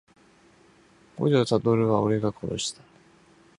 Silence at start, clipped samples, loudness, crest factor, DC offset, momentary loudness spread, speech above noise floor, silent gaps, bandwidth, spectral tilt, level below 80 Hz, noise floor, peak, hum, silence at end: 1.15 s; under 0.1%; -25 LUFS; 20 dB; under 0.1%; 9 LU; 34 dB; none; 11.5 kHz; -6 dB/octave; -58 dBFS; -57 dBFS; -6 dBFS; none; 0.85 s